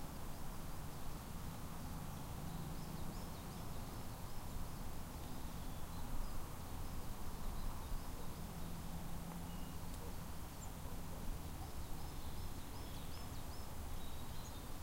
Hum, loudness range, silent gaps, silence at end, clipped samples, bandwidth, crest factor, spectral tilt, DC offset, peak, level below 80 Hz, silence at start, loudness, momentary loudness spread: none; 1 LU; none; 0 s; under 0.1%; 16 kHz; 14 dB; -5 dB/octave; under 0.1%; -30 dBFS; -48 dBFS; 0 s; -50 LUFS; 2 LU